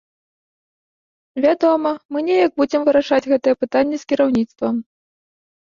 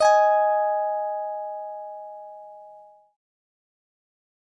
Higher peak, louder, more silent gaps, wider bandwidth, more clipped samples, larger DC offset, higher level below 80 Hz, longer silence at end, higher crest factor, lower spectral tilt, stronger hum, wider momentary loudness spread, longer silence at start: first, -4 dBFS vs -8 dBFS; first, -18 LUFS vs -23 LUFS; first, 2.05-2.09 s vs none; second, 7.4 kHz vs 11 kHz; neither; neither; first, -58 dBFS vs -80 dBFS; second, 0.8 s vs 1.7 s; about the same, 14 dB vs 18 dB; first, -5.5 dB/octave vs 0.5 dB/octave; neither; second, 7 LU vs 24 LU; first, 1.35 s vs 0 s